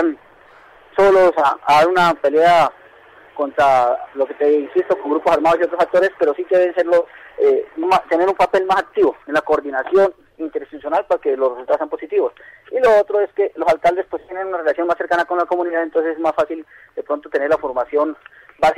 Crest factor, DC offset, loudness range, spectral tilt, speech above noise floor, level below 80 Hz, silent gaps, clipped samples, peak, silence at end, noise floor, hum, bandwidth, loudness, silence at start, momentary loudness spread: 10 dB; under 0.1%; 4 LU; -5 dB/octave; 30 dB; -54 dBFS; none; under 0.1%; -6 dBFS; 0.05 s; -47 dBFS; none; 14 kHz; -17 LUFS; 0 s; 12 LU